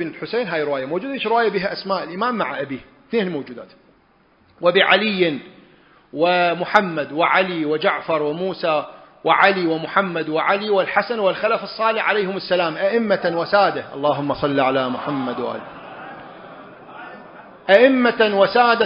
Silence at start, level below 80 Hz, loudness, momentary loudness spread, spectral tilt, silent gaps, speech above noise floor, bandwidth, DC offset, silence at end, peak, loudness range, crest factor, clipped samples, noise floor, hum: 0 s; -60 dBFS; -19 LUFS; 21 LU; -7 dB/octave; none; 37 dB; 6.8 kHz; under 0.1%; 0 s; 0 dBFS; 5 LU; 20 dB; under 0.1%; -56 dBFS; none